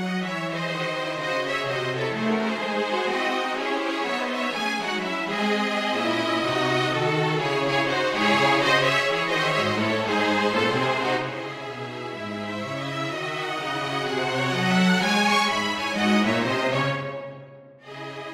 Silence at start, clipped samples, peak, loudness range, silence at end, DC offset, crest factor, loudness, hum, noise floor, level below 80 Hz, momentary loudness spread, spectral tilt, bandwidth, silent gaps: 0 s; under 0.1%; -8 dBFS; 5 LU; 0 s; under 0.1%; 18 dB; -24 LUFS; none; -45 dBFS; -64 dBFS; 11 LU; -4.5 dB/octave; 16 kHz; none